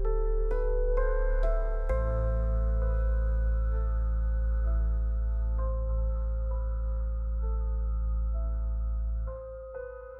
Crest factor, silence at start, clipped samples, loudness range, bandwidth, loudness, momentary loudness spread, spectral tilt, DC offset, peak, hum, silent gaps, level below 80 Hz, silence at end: 10 dB; 0 s; under 0.1%; 3 LU; 2.2 kHz; -32 LUFS; 4 LU; -10.5 dB/octave; under 0.1%; -18 dBFS; none; none; -28 dBFS; 0 s